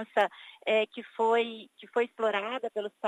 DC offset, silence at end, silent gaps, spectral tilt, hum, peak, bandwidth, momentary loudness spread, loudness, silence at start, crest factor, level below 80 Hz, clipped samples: under 0.1%; 0 s; none; -4 dB/octave; none; -12 dBFS; 10.5 kHz; 9 LU; -30 LUFS; 0 s; 18 dB; under -90 dBFS; under 0.1%